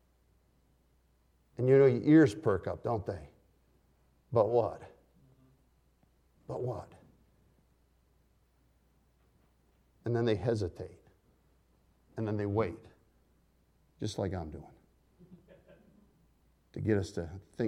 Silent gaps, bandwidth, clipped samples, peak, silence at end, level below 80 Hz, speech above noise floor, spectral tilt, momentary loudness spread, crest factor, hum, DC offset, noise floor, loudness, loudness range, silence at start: none; 11 kHz; under 0.1%; -12 dBFS; 0 s; -62 dBFS; 40 dB; -8 dB/octave; 23 LU; 22 dB; none; under 0.1%; -70 dBFS; -31 LUFS; 17 LU; 1.6 s